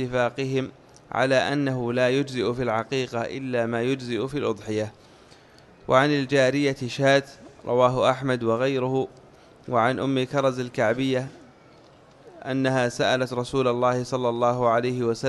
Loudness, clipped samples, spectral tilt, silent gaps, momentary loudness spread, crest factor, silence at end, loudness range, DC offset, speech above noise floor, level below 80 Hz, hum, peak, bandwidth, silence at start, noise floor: -24 LUFS; under 0.1%; -6 dB/octave; none; 8 LU; 20 dB; 0 s; 4 LU; under 0.1%; 28 dB; -58 dBFS; none; -4 dBFS; 12 kHz; 0 s; -52 dBFS